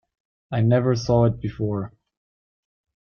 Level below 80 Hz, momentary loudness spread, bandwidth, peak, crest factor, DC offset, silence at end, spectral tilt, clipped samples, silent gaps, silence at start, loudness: -48 dBFS; 11 LU; 6.8 kHz; -6 dBFS; 16 dB; under 0.1%; 1.15 s; -8 dB/octave; under 0.1%; none; 0.5 s; -22 LUFS